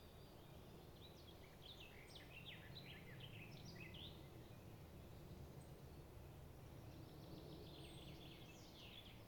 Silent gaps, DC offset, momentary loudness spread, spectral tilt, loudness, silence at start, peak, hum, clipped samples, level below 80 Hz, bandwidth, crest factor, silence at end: none; under 0.1%; 5 LU; -5 dB/octave; -59 LUFS; 0 s; -44 dBFS; none; under 0.1%; -68 dBFS; 19 kHz; 16 dB; 0 s